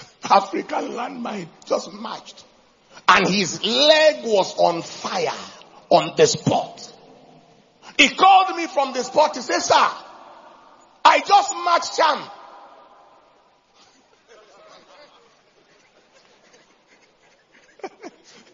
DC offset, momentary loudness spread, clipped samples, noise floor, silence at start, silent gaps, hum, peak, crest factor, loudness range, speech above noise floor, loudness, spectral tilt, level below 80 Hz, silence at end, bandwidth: under 0.1%; 20 LU; under 0.1%; -57 dBFS; 0 s; none; none; 0 dBFS; 22 dB; 4 LU; 38 dB; -18 LUFS; -3 dB/octave; -66 dBFS; 0.45 s; 7.6 kHz